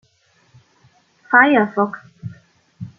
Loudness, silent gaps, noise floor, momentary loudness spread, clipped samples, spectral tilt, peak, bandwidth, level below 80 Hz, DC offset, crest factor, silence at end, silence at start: -15 LUFS; none; -59 dBFS; 24 LU; under 0.1%; -7.5 dB/octave; -2 dBFS; 6.8 kHz; -66 dBFS; under 0.1%; 18 dB; 0.1 s; 1.3 s